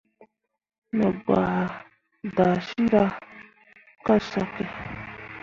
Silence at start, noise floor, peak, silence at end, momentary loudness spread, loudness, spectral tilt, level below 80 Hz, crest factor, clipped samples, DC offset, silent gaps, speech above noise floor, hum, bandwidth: 0.2 s; -58 dBFS; -6 dBFS; 0.05 s; 16 LU; -25 LUFS; -8 dB/octave; -54 dBFS; 20 dB; under 0.1%; under 0.1%; 0.78-0.82 s; 35 dB; none; 7.2 kHz